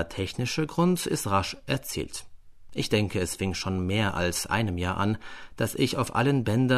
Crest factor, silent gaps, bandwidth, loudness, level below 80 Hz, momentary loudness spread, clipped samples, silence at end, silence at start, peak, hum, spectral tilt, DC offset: 18 dB; none; 13.5 kHz; -27 LUFS; -48 dBFS; 8 LU; under 0.1%; 0 s; 0 s; -10 dBFS; none; -5 dB/octave; under 0.1%